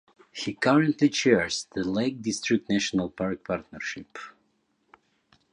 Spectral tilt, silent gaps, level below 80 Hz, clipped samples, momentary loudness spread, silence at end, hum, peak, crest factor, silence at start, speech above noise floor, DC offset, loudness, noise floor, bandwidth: -4.5 dB/octave; none; -60 dBFS; under 0.1%; 16 LU; 1.25 s; none; -6 dBFS; 22 dB; 0.35 s; 45 dB; under 0.1%; -26 LUFS; -71 dBFS; 10.5 kHz